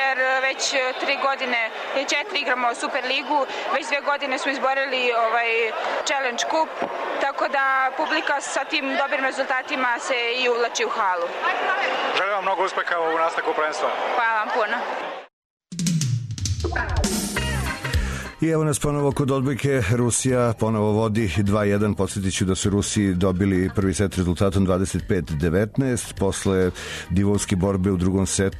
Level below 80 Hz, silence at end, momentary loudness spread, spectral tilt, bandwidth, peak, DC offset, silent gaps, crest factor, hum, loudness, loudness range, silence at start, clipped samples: -40 dBFS; 0 s; 5 LU; -4.5 dB/octave; 13.5 kHz; -10 dBFS; under 0.1%; 15.33-15.57 s; 14 dB; none; -22 LUFS; 3 LU; 0 s; under 0.1%